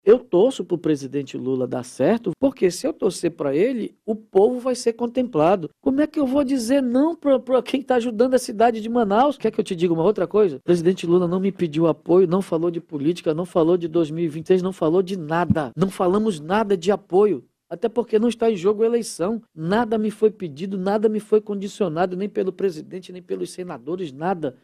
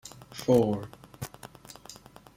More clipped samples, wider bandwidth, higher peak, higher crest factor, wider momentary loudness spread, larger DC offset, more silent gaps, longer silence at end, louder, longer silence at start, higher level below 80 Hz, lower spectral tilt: neither; second, 14 kHz vs 16.5 kHz; first, -4 dBFS vs -8 dBFS; second, 16 dB vs 22 dB; second, 8 LU vs 23 LU; neither; neither; second, 0.1 s vs 0.45 s; first, -21 LUFS vs -27 LUFS; about the same, 0.05 s vs 0.05 s; about the same, -58 dBFS vs -60 dBFS; about the same, -6.5 dB/octave vs -6.5 dB/octave